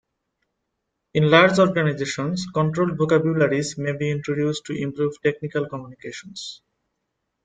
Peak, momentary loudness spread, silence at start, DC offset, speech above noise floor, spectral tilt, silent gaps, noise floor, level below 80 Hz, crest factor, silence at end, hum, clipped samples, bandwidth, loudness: -2 dBFS; 18 LU; 1.15 s; under 0.1%; 57 dB; -6 dB/octave; none; -78 dBFS; -60 dBFS; 20 dB; 0.9 s; none; under 0.1%; 9.2 kHz; -21 LUFS